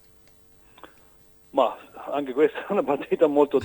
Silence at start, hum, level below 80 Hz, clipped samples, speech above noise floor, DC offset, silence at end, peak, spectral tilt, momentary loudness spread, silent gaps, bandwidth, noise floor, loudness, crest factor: 1.55 s; none; -66 dBFS; under 0.1%; 32 dB; under 0.1%; 0 s; -6 dBFS; -6.5 dB/octave; 10 LU; none; 19.5 kHz; -55 dBFS; -24 LUFS; 20 dB